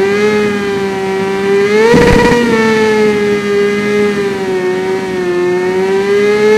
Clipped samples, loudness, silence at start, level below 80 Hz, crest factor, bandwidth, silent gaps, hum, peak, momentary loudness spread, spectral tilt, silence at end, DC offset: 0.1%; -11 LUFS; 0 s; -30 dBFS; 10 dB; 14 kHz; none; none; 0 dBFS; 7 LU; -5.5 dB/octave; 0 s; under 0.1%